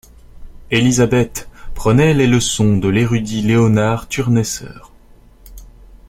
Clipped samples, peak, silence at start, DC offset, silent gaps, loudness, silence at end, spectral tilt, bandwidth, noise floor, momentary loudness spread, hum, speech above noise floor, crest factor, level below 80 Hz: under 0.1%; -2 dBFS; 0.35 s; under 0.1%; none; -15 LUFS; 0.15 s; -5.5 dB/octave; 16 kHz; -44 dBFS; 10 LU; none; 30 dB; 14 dB; -36 dBFS